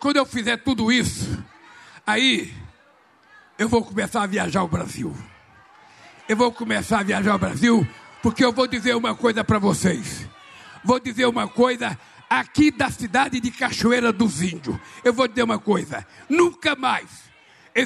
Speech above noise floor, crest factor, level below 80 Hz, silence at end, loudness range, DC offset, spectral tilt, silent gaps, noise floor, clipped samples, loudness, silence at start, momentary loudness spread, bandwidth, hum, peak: 35 dB; 16 dB; -50 dBFS; 0 s; 4 LU; under 0.1%; -4.5 dB/octave; none; -56 dBFS; under 0.1%; -21 LUFS; 0 s; 12 LU; 13 kHz; none; -6 dBFS